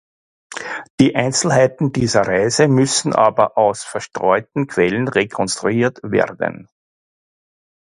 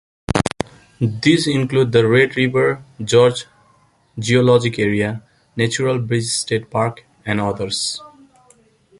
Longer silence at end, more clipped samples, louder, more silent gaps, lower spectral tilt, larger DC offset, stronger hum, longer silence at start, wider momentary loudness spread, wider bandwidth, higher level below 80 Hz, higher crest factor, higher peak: first, 1.4 s vs 0.95 s; neither; about the same, -17 LUFS vs -18 LUFS; first, 0.90-0.98 s vs none; about the same, -4.5 dB/octave vs -5 dB/octave; neither; neither; first, 0.5 s vs 0.3 s; second, 11 LU vs 14 LU; about the same, 11.5 kHz vs 11.5 kHz; second, -52 dBFS vs -46 dBFS; about the same, 18 dB vs 18 dB; about the same, 0 dBFS vs 0 dBFS